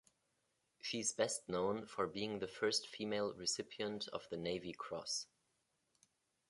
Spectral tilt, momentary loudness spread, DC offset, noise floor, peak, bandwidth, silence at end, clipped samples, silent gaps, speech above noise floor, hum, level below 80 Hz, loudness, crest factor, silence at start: -2.5 dB/octave; 7 LU; under 0.1%; -83 dBFS; -20 dBFS; 11.5 kHz; 1.25 s; under 0.1%; none; 42 dB; none; -76 dBFS; -41 LUFS; 24 dB; 0.85 s